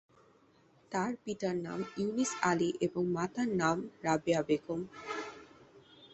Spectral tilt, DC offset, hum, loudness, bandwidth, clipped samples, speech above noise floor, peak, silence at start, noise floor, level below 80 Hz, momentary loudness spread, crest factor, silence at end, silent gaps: -5 dB/octave; under 0.1%; none; -34 LUFS; 8.4 kHz; under 0.1%; 32 dB; -14 dBFS; 0.9 s; -65 dBFS; -68 dBFS; 10 LU; 20 dB; 0 s; none